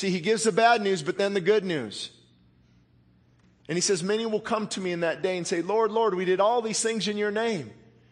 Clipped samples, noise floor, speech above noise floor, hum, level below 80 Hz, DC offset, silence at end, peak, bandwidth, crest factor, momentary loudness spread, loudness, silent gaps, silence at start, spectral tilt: under 0.1%; -61 dBFS; 35 dB; none; -70 dBFS; under 0.1%; 0.4 s; -6 dBFS; 10.5 kHz; 20 dB; 9 LU; -26 LUFS; none; 0 s; -3.5 dB/octave